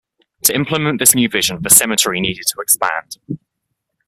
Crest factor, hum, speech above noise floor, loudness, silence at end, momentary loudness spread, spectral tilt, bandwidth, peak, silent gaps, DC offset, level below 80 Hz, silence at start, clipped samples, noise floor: 18 dB; none; 58 dB; -13 LUFS; 0.7 s; 19 LU; -2 dB/octave; over 20 kHz; 0 dBFS; none; under 0.1%; -50 dBFS; 0.45 s; 0.2%; -74 dBFS